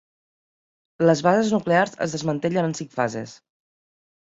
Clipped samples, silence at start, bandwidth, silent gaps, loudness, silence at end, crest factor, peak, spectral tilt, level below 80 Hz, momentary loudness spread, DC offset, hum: under 0.1%; 1 s; 8 kHz; none; -22 LUFS; 0.95 s; 20 dB; -4 dBFS; -6 dB/octave; -64 dBFS; 8 LU; under 0.1%; none